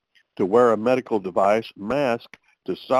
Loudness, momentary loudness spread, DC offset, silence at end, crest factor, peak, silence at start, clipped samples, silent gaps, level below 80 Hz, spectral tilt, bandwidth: -21 LUFS; 14 LU; under 0.1%; 0 s; 16 dB; -6 dBFS; 0.4 s; under 0.1%; none; -62 dBFS; -6.5 dB/octave; 13 kHz